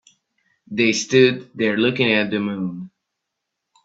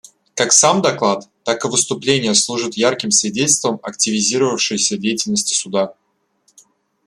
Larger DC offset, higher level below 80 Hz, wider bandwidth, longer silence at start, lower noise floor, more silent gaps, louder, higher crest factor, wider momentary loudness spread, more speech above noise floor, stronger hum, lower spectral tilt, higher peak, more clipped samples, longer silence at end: neither; about the same, -62 dBFS vs -62 dBFS; second, 8 kHz vs 14.5 kHz; first, 0.7 s vs 0.35 s; first, -80 dBFS vs -63 dBFS; neither; second, -19 LUFS vs -16 LUFS; about the same, 20 dB vs 18 dB; first, 13 LU vs 9 LU; first, 61 dB vs 46 dB; neither; first, -4.5 dB/octave vs -2 dB/octave; about the same, -2 dBFS vs 0 dBFS; neither; second, 1 s vs 1.15 s